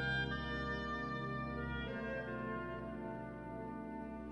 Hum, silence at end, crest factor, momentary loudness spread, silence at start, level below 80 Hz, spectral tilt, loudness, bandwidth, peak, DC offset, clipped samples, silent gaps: none; 0 s; 14 dB; 7 LU; 0 s; -54 dBFS; -7 dB/octave; -42 LUFS; 11 kHz; -28 dBFS; under 0.1%; under 0.1%; none